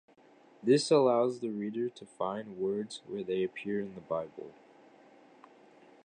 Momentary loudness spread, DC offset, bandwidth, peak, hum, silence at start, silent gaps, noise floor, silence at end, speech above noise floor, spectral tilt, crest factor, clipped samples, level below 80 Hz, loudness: 14 LU; under 0.1%; 10 kHz; -14 dBFS; none; 0.6 s; none; -61 dBFS; 1.55 s; 29 dB; -5.5 dB/octave; 20 dB; under 0.1%; -78 dBFS; -32 LUFS